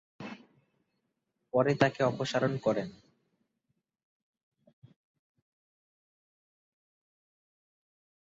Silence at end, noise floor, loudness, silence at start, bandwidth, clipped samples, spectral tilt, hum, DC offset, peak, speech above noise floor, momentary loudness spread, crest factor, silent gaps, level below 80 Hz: 5.35 s; -82 dBFS; -30 LUFS; 0.2 s; 7.6 kHz; under 0.1%; -5 dB/octave; none; under 0.1%; -10 dBFS; 53 dB; 19 LU; 26 dB; none; -74 dBFS